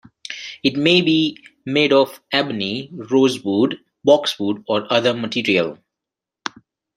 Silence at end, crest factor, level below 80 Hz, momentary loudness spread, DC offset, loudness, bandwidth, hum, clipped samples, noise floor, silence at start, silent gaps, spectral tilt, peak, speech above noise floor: 1.2 s; 18 dB; -64 dBFS; 16 LU; under 0.1%; -18 LUFS; 15.5 kHz; none; under 0.1%; -86 dBFS; 0.3 s; none; -5 dB/octave; 0 dBFS; 68 dB